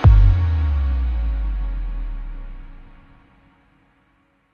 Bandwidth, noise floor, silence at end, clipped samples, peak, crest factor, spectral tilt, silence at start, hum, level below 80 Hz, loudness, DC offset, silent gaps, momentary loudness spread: 4.4 kHz; -62 dBFS; 1.7 s; under 0.1%; -2 dBFS; 18 dB; -9.5 dB/octave; 0 s; none; -20 dBFS; -21 LUFS; under 0.1%; none; 22 LU